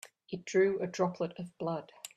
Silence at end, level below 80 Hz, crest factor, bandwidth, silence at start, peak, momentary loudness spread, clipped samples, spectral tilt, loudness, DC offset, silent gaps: 0.1 s; -76 dBFS; 16 dB; 13 kHz; 0.05 s; -18 dBFS; 12 LU; under 0.1%; -5.5 dB/octave; -33 LUFS; under 0.1%; none